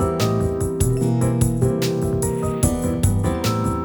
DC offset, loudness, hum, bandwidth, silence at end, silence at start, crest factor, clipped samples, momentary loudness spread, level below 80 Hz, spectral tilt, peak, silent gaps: under 0.1%; -20 LUFS; none; over 20 kHz; 0 s; 0 s; 18 dB; under 0.1%; 2 LU; -32 dBFS; -6 dB/octave; -2 dBFS; none